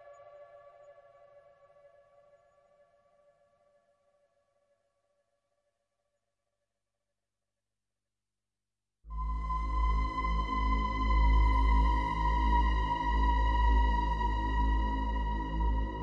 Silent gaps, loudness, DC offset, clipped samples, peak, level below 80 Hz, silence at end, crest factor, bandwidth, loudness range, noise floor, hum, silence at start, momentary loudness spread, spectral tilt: none; -31 LUFS; under 0.1%; under 0.1%; -16 dBFS; -34 dBFS; 0 s; 16 dB; 6 kHz; 10 LU; under -90 dBFS; 50 Hz at -70 dBFS; 0.05 s; 7 LU; -7 dB/octave